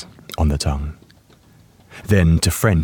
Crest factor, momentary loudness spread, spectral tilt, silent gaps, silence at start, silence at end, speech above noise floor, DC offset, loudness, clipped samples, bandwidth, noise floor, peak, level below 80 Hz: 18 dB; 17 LU; -5.5 dB/octave; none; 0 s; 0 s; 34 dB; under 0.1%; -18 LUFS; under 0.1%; 18 kHz; -50 dBFS; -2 dBFS; -30 dBFS